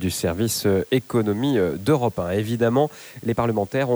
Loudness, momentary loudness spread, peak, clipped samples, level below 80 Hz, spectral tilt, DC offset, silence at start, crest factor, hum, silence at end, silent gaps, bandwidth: -22 LUFS; 4 LU; -6 dBFS; under 0.1%; -50 dBFS; -5.5 dB/octave; under 0.1%; 0 s; 14 dB; none; 0 s; none; over 20 kHz